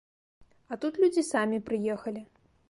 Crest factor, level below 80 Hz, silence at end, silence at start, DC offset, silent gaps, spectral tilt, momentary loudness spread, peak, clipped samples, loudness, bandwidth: 16 dB; -68 dBFS; 0.45 s; 0.7 s; under 0.1%; none; -5 dB/octave; 14 LU; -14 dBFS; under 0.1%; -29 LUFS; 11.5 kHz